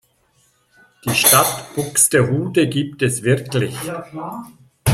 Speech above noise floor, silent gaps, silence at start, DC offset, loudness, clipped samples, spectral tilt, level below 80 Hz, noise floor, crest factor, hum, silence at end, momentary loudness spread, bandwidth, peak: 42 dB; none; 1.05 s; under 0.1%; -16 LUFS; under 0.1%; -3.5 dB/octave; -48 dBFS; -60 dBFS; 20 dB; none; 0 s; 18 LU; 16.5 kHz; 0 dBFS